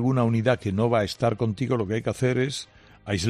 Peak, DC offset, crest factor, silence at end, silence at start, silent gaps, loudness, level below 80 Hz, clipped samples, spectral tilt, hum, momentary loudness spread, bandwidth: -8 dBFS; under 0.1%; 16 dB; 0 s; 0 s; none; -25 LUFS; -54 dBFS; under 0.1%; -6.5 dB/octave; none; 9 LU; 13.5 kHz